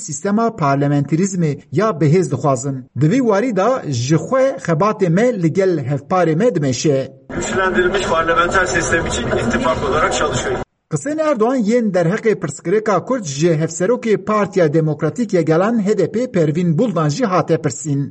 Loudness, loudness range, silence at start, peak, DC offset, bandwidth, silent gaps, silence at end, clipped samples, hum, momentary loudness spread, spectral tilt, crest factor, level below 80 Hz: -17 LUFS; 1 LU; 0 s; -2 dBFS; under 0.1%; 10 kHz; none; 0 s; under 0.1%; none; 5 LU; -6 dB/octave; 14 dB; -40 dBFS